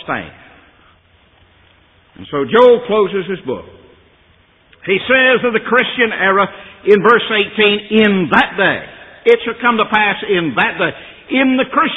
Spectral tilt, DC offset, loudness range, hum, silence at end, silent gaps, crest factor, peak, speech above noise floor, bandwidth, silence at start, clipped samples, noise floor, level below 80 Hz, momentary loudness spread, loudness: -7 dB/octave; under 0.1%; 4 LU; none; 0 s; none; 14 dB; 0 dBFS; 38 dB; 5.6 kHz; 0.05 s; under 0.1%; -51 dBFS; -52 dBFS; 13 LU; -13 LUFS